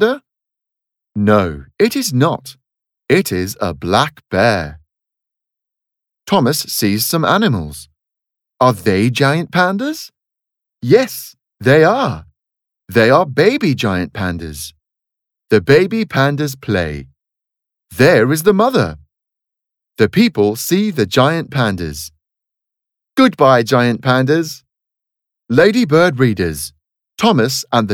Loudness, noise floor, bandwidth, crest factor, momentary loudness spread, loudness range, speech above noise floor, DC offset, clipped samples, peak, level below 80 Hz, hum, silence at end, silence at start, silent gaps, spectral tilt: -14 LUFS; -83 dBFS; 18.5 kHz; 16 dB; 15 LU; 3 LU; 70 dB; under 0.1%; under 0.1%; 0 dBFS; -46 dBFS; none; 0 s; 0 s; none; -5.5 dB/octave